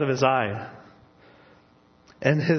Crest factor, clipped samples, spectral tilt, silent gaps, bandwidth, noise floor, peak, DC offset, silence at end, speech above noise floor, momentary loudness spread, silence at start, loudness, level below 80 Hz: 22 dB; under 0.1%; -6.5 dB/octave; none; 6.6 kHz; -58 dBFS; -4 dBFS; under 0.1%; 0 s; 35 dB; 15 LU; 0 s; -24 LUFS; -64 dBFS